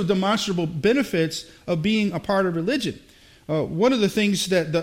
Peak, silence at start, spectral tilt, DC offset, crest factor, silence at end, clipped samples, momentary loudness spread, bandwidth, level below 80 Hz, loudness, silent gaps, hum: -6 dBFS; 0 s; -5 dB/octave; under 0.1%; 16 dB; 0 s; under 0.1%; 7 LU; 16.5 kHz; -54 dBFS; -23 LUFS; none; none